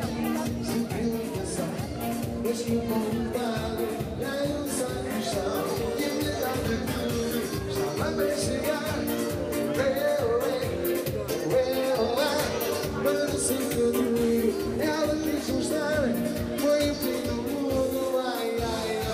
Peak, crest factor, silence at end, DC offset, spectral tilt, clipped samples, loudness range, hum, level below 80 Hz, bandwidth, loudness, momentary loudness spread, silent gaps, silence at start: -14 dBFS; 14 dB; 0 s; under 0.1%; -5 dB/octave; under 0.1%; 3 LU; none; -46 dBFS; 16 kHz; -28 LUFS; 5 LU; none; 0 s